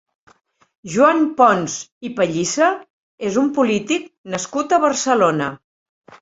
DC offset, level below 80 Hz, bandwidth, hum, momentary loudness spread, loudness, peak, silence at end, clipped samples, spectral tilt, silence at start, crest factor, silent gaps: under 0.1%; -62 dBFS; 8 kHz; none; 13 LU; -18 LUFS; -2 dBFS; 0.65 s; under 0.1%; -4 dB/octave; 0.85 s; 18 dB; 1.92-2.01 s, 2.90-3.18 s, 4.18-4.24 s